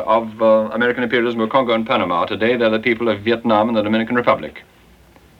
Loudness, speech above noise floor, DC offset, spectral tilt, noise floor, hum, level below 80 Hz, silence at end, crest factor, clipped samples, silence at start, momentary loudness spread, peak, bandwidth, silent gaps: -17 LUFS; 31 dB; under 0.1%; -7 dB/octave; -48 dBFS; none; -54 dBFS; 0.8 s; 16 dB; under 0.1%; 0 s; 3 LU; 0 dBFS; 6.4 kHz; none